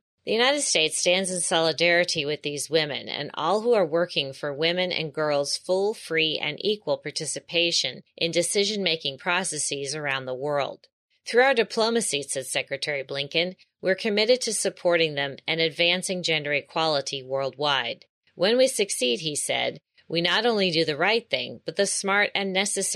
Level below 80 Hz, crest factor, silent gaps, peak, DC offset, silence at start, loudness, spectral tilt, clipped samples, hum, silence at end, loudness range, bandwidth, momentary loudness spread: -76 dBFS; 18 dB; 10.92-11.09 s, 18.09-18.22 s; -8 dBFS; under 0.1%; 0.25 s; -24 LUFS; -2.5 dB/octave; under 0.1%; none; 0 s; 2 LU; 14 kHz; 8 LU